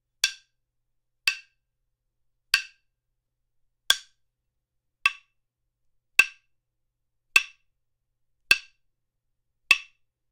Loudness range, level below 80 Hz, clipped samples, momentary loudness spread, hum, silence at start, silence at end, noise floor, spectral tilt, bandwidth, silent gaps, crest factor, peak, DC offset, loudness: 5 LU; -68 dBFS; under 0.1%; 7 LU; none; 0.25 s; 0.5 s; -80 dBFS; 2.5 dB/octave; 16 kHz; none; 28 dB; -2 dBFS; under 0.1%; -24 LUFS